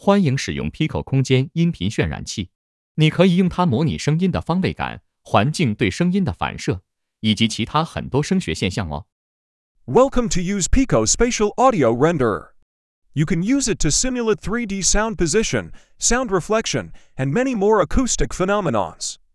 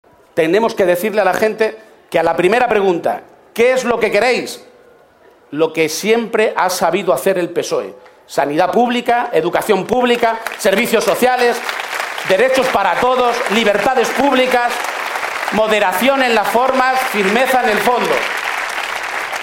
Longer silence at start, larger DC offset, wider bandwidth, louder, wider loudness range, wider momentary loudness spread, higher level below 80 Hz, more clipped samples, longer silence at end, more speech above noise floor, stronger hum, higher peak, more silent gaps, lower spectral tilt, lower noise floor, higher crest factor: second, 0.05 s vs 0.35 s; neither; second, 12 kHz vs 16.5 kHz; second, -20 LUFS vs -15 LUFS; about the same, 3 LU vs 3 LU; first, 10 LU vs 7 LU; first, -34 dBFS vs -52 dBFS; neither; first, 0.2 s vs 0 s; first, over 71 dB vs 33 dB; neither; about the same, 0 dBFS vs 0 dBFS; first, 2.55-2.95 s, 9.12-9.75 s, 12.62-13.02 s vs none; about the same, -4.5 dB/octave vs -3.5 dB/octave; first, under -90 dBFS vs -47 dBFS; about the same, 18 dB vs 16 dB